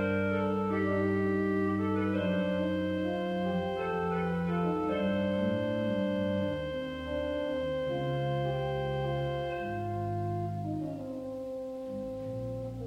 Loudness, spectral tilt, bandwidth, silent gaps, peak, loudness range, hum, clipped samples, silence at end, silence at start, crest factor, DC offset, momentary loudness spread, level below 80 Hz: -32 LUFS; -8 dB/octave; 9.6 kHz; none; -18 dBFS; 5 LU; none; under 0.1%; 0 s; 0 s; 14 dB; under 0.1%; 8 LU; -54 dBFS